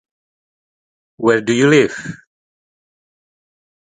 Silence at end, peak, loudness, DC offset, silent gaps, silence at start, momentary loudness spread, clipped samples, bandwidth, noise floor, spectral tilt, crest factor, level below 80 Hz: 1.8 s; 0 dBFS; -14 LUFS; under 0.1%; none; 1.2 s; 16 LU; under 0.1%; 9.4 kHz; under -90 dBFS; -5.5 dB/octave; 20 dB; -62 dBFS